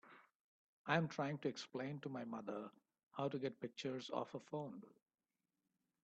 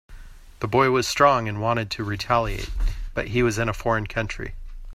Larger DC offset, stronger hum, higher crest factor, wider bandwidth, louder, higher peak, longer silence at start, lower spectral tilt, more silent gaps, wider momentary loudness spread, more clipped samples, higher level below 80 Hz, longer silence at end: neither; neither; about the same, 24 dB vs 20 dB; second, 8.4 kHz vs 15.5 kHz; second, -45 LUFS vs -23 LUFS; second, -22 dBFS vs -4 dBFS; about the same, 0.05 s vs 0.1 s; about the same, -6 dB/octave vs -5 dB/octave; first, 0.35-0.84 s, 3.03-3.07 s vs none; about the same, 14 LU vs 12 LU; neither; second, -86 dBFS vs -34 dBFS; first, 1.15 s vs 0 s